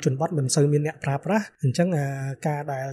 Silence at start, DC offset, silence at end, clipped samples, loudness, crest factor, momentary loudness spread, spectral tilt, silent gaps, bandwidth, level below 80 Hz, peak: 0 s; under 0.1%; 0 s; under 0.1%; -25 LUFS; 14 dB; 8 LU; -6 dB/octave; none; 13.5 kHz; -64 dBFS; -10 dBFS